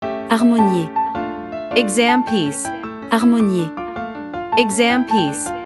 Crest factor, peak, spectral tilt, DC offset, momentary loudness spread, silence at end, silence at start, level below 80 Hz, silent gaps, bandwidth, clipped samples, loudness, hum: 18 dB; 0 dBFS; -4.5 dB/octave; under 0.1%; 13 LU; 0 s; 0 s; -52 dBFS; none; 12 kHz; under 0.1%; -17 LUFS; none